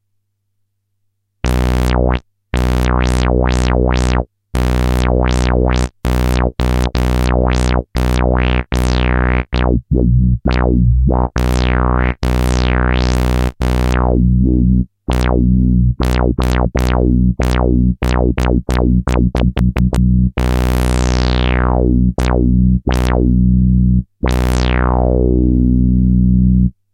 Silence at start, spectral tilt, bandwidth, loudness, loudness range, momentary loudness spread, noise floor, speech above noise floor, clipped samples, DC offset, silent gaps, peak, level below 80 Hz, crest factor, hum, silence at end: 1.45 s; -7 dB/octave; 12.5 kHz; -15 LUFS; 2 LU; 4 LU; -66 dBFS; 54 dB; under 0.1%; under 0.1%; none; 0 dBFS; -16 dBFS; 14 dB; none; 0.25 s